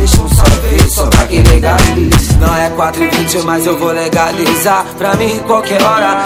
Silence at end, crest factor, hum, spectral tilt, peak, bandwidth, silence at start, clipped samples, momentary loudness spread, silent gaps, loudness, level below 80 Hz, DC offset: 0 s; 10 dB; none; -5 dB/octave; 0 dBFS; 16.5 kHz; 0 s; 2%; 4 LU; none; -10 LUFS; -14 dBFS; under 0.1%